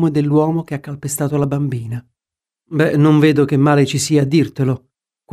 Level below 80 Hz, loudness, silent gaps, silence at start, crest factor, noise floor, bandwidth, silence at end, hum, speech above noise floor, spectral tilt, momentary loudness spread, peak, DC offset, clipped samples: -54 dBFS; -16 LUFS; none; 0 s; 14 dB; -88 dBFS; 15 kHz; 0.55 s; none; 73 dB; -6.5 dB/octave; 13 LU; -2 dBFS; under 0.1%; under 0.1%